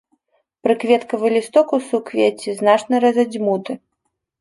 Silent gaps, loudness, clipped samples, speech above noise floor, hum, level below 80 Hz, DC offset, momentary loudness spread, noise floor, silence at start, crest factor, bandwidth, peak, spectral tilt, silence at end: none; -18 LUFS; under 0.1%; 57 dB; none; -70 dBFS; under 0.1%; 8 LU; -74 dBFS; 0.65 s; 16 dB; 11.5 kHz; -2 dBFS; -5 dB/octave; 0.65 s